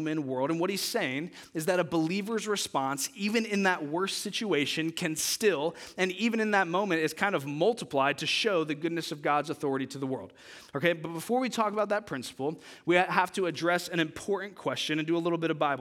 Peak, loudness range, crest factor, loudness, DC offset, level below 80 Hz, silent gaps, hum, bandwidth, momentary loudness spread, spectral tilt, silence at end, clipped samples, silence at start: -8 dBFS; 3 LU; 22 dB; -29 LUFS; under 0.1%; -74 dBFS; none; none; 17.5 kHz; 8 LU; -4 dB/octave; 0 s; under 0.1%; 0 s